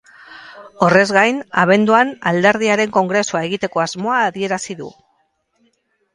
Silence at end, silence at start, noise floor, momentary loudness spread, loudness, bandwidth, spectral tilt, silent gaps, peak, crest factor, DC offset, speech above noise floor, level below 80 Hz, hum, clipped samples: 1.25 s; 0.3 s; -64 dBFS; 14 LU; -15 LUFS; 11.5 kHz; -4.5 dB/octave; none; 0 dBFS; 18 dB; under 0.1%; 48 dB; -60 dBFS; none; under 0.1%